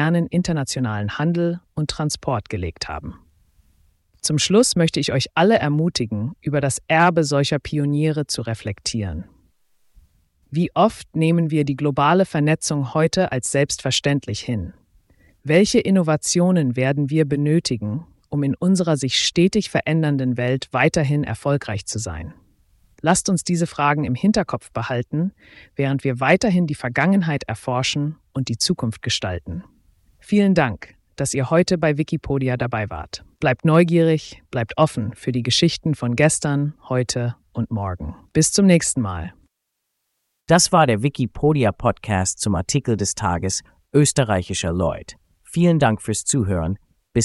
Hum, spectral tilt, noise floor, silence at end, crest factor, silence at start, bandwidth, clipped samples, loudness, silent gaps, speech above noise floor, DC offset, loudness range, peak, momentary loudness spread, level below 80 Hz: none; -5 dB/octave; -77 dBFS; 0 s; 18 dB; 0 s; 12 kHz; under 0.1%; -20 LUFS; none; 57 dB; under 0.1%; 4 LU; -2 dBFS; 11 LU; -46 dBFS